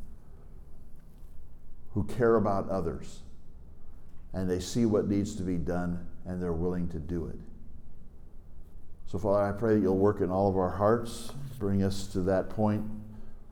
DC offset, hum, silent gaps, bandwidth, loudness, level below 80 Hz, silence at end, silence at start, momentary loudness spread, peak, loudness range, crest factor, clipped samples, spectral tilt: under 0.1%; none; none; 16.5 kHz; -30 LUFS; -46 dBFS; 0 s; 0 s; 15 LU; -14 dBFS; 7 LU; 16 dB; under 0.1%; -7.5 dB/octave